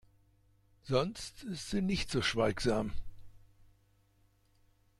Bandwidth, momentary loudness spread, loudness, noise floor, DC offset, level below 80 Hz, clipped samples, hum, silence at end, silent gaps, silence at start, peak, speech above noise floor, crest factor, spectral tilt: 13.5 kHz; 11 LU; -34 LUFS; -70 dBFS; under 0.1%; -50 dBFS; under 0.1%; none; 1.6 s; none; 0.85 s; -18 dBFS; 36 dB; 20 dB; -5 dB/octave